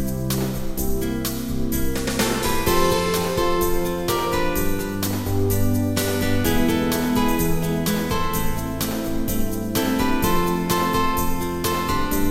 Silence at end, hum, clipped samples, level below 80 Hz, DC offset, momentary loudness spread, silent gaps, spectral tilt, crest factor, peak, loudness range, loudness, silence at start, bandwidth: 0 s; none; under 0.1%; -30 dBFS; 0.7%; 5 LU; none; -5 dB/octave; 14 dB; -6 dBFS; 1 LU; -22 LUFS; 0 s; 16.5 kHz